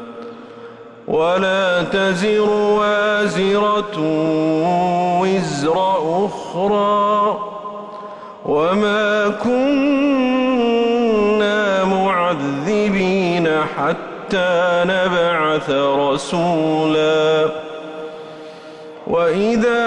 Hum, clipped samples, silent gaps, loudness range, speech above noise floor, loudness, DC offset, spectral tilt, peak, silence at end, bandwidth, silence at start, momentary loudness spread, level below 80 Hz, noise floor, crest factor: none; under 0.1%; none; 3 LU; 21 dB; -17 LUFS; under 0.1%; -5.5 dB/octave; -6 dBFS; 0 s; 11 kHz; 0 s; 15 LU; -52 dBFS; -37 dBFS; 10 dB